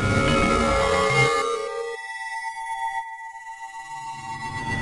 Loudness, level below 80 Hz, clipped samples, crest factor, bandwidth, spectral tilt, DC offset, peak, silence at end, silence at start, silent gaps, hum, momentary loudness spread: -23 LUFS; -40 dBFS; under 0.1%; 18 dB; 11.5 kHz; -4.5 dB/octave; under 0.1%; -8 dBFS; 0 s; 0 s; none; none; 17 LU